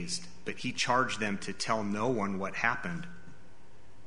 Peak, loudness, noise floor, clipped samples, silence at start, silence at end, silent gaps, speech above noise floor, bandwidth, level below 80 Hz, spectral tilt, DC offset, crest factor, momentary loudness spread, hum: -12 dBFS; -32 LUFS; -58 dBFS; under 0.1%; 0 s; 0.05 s; none; 26 dB; 10.5 kHz; -62 dBFS; -4 dB/octave; 1%; 22 dB; 11 LU; none